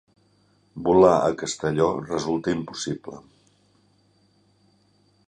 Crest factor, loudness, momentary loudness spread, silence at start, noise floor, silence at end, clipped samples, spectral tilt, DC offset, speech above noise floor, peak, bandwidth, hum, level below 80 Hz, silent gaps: 22 dB; -23 LUFS; 20 LU; 0.75 s; -62 dBFS; 2.1 s; under 0.1%; -5.5 dB/octave; under 0.1%; 40 dB; -4 dBFS; 10.5 kHz; 50 Hz at -60 dBFS; -54 dBFS; none